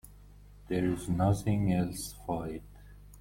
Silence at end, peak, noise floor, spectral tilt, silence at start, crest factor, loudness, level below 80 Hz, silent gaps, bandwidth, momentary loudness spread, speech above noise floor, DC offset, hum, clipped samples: 0 s; -14 dBFS; -53 dBFS; -7 dB/octave; 0.05 s; 18 dB; -32 LUFS; -50 dBFS; none; 16.5 kHz; 10 LU; 23 dB; under 0.1%; 50 Hz at -45 dBFS; under 0.1%